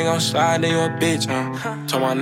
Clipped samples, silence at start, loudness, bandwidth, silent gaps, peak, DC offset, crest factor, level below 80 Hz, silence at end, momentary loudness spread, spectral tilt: under 0.1%; 0 s; -20 LUFS; 16.5 kHz; none; -6 dBFS; under 0.1%; 14 dB; -66 dBFS; 0 s; 6 LU; -4.5 dB/octave